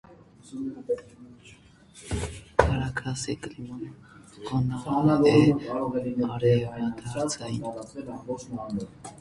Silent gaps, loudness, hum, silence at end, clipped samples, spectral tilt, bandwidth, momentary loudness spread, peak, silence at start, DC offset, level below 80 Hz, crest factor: none; -27 LUFS; none; 0 s; under 0.1%; -6.5 dB/octave; 11.5 kHz; 18 LU; 0 dBFS; 0.1 s; under 0.1%; -44 dBFS; 26 dB